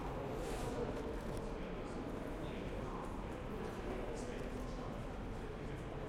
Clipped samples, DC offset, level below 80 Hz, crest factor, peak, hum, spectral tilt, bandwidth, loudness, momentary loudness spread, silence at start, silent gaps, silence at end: under 0.1%; under 0.1%; -50 dBFS; 14 dB; -30 dBFS; none; -6.5 dB/octave; 16 kHz; -45 LUFS; 4 LU; 0 s; none; 0 s